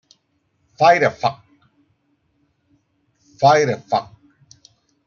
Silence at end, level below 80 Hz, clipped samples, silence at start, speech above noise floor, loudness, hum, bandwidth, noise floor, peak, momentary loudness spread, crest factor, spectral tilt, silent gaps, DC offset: 1.05 s; -64 dBFS; under 0.1%; 0.8 s; 51 dB; -17 LUFS; none; 7.2 kHz; -67 dBFS; -2 dBFS; 10 LU; 20 dB; -5 dB/octave; none; under 0.1%